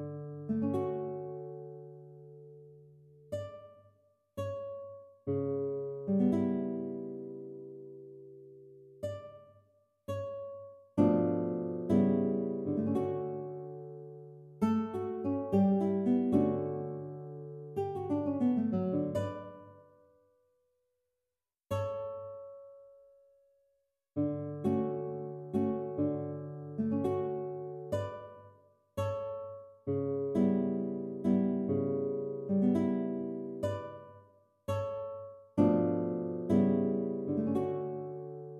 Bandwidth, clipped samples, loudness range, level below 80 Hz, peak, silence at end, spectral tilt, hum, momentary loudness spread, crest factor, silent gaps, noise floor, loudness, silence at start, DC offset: 12 kHz; under 0.1%; 12 LU; -72 dBFS; -14 dBFS; 0 s; -9.5 dB/octave; none; 19 LU; 20 dB; none; under -90 dBFS; -34 LUFS; 0 s; under 0.1%